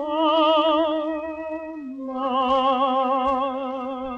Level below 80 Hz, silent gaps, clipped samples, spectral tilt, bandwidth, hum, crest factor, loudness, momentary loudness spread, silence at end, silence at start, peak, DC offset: -56 dBFS; none; under 0.1%; -5 dB/octave; 7.4 kHz; none; 14 dB; -22 LUFS; 13 LU; 0 s; 0 s; -8 dBFS; under 0.1%